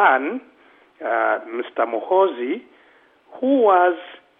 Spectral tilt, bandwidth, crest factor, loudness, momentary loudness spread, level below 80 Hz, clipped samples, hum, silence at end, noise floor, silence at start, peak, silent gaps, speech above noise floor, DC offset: -7 dB/octave; 3.8 kHz; 18 dB; -20 LUFS; 15 LU; -80 dBFS; under 0.1%; none; 0.25 s; -54 dBFS; 0 s; -4 dBFS; none; 35 dB; under 0.1%